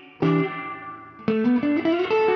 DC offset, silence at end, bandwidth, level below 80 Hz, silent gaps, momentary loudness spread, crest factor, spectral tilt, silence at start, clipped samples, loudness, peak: under 0.1%; 0 s; 6.2 kHz; -64 dBFS; none; 13 LU; 14 dB; -8.5 dB/octave; 0 s; under 0.1%; -23 LUFS; -8 dBFS